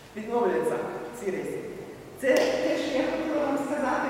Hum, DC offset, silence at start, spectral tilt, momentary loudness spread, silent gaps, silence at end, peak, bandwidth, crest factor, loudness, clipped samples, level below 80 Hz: none; under 0.1%; 0 s; -4.5 dB/octave; 12 LU; none; 0 s; -10 dBFS; 16.5 kHz; 18 dB; -28 LUFS; under 0.1%; -60 dBFS